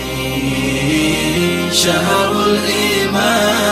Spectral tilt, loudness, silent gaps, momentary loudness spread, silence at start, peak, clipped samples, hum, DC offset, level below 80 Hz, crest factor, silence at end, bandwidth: -3.5 dB/octave; -14 LUFS; none; 4 LU; 0 s; 0 dBFS; under 0.1%; none; under 0.1%; -36 dBFS; 14 dB; 0 s; 16 kHz